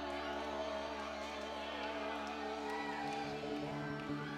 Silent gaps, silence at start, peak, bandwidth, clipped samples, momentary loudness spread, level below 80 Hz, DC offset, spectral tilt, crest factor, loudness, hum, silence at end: none; 0 s; -28 dBFS; 15.5 kHz; under 0.1%; 2 LU; -62 dBFS; under 0.1%; -5 dB/octave; 14 dB; -42 LUFS; none; 0 s